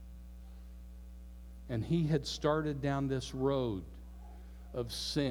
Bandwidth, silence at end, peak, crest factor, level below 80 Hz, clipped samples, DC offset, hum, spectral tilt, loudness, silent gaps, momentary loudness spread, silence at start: 18.5 kHz; 0 s; -16 dBFS; 20 dB; -50 dBFS; under 0.1%; under 0.1%; none; -6 dB/octave; -35 LUFS; none; 19 LU; 0 s